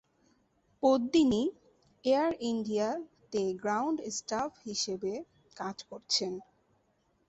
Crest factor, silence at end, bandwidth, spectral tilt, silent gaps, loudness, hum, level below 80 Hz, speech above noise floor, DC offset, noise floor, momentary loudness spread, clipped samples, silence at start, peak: 20 dB; 0.85 s; 8.4 kHz; -3.5 dB/octave; none; -32 LUFS; none; -66 dBFS; 42 dB; under 0.1%; -73 dBFS; 14 LU; under 0.1%; 0.8 s; -14 dBFS